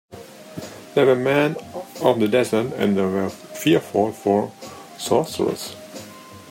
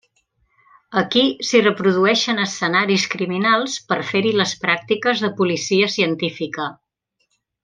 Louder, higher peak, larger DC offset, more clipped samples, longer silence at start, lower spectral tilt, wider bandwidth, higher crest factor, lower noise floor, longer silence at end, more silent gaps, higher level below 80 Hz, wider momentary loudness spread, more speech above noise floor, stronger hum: second, -21 LUFS vs -18 LUFS; about the same, -2 dBFS vs -2 dBFS; neither; neither; second, 0.1 s vs 0.9 s; first, -5.5 dB/octave vs -4 dB/octave; first, 16.5 kHz vs 9.8 kHz; about the same, 18 dB vs 18 dB; second, -41 dBFS vs -71 dBFS; second, 0 s vs 0.9 s; neither; about the same, -64 dBFS vs -64 dBFS; first, 20 LU vs 7 LU; second, 21 dB vs 52 dB; neither